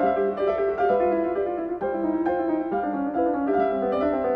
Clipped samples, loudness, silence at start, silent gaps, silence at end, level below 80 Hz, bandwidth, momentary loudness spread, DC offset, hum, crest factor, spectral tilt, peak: under 0.1%; -24 LUFS; 0 s; none; 0 s; -54 dBFS; 5 kHz; 4 LU; under 0.1%; none; 14 dB; -9 dB/octave; -10 dBFS